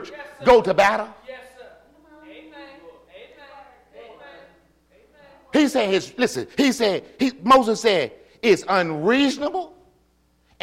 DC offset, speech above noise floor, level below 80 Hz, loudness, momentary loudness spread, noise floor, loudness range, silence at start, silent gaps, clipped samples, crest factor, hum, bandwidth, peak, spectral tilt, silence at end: under 0.1%; 43 dB; -54 dBFS; -20 LUFS; 23 LU; -62 dBFS; 8 LU; 0 s; none; under 0.1%; 16 dB; none; 16 kHz; -6 dBFS; -4 dB/octave; 0.95 s